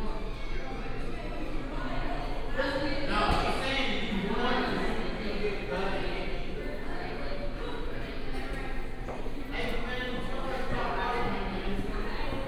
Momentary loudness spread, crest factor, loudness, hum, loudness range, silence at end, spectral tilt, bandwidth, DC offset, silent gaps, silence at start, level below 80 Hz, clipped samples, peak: 9 LU; 16 dB; -34 LUFS; none; 7 LU; 0 s; -5.5 dB/octave; 10.5 kHz; under 0.1%; none; 0 s; -34 dBFS; under 0.1%; -14 dBFS